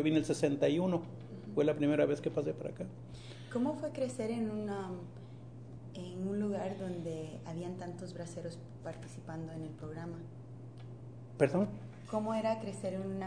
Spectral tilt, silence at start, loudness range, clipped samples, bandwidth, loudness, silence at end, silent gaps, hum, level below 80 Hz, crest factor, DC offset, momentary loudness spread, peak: -7 dB/octave; 0 s; 10 LU; under 0.1%; 10 kHz; -37 LUFS; 0 s; none; none; -66 dBFS; 24 dB; under 0.1%; 18 LU; -14 dBFS